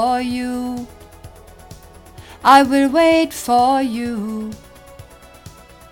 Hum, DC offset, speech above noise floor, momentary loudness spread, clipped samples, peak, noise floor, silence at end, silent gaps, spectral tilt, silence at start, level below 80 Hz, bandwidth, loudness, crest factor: none; under 0.1%; 25 dB; 18 LU; under 0.1%; 0 dBFS; -41 dBFS; 0.4 s; none; -4 dB/octave; 0 s; -46 dBFS; 17 kHz; -16 LUFS; 18 dB